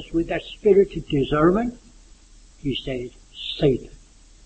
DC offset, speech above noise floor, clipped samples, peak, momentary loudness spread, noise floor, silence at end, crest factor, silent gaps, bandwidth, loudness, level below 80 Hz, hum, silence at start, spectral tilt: under 0.1%; 27 dB; under 0.1%; -4 dBFS; 14 LU; -49 dBFS; 0.5 s; 18 dB; none; 8.6 kHz; -22 LUFS; -42 dBFS; none; 0 s; -7 dB/octave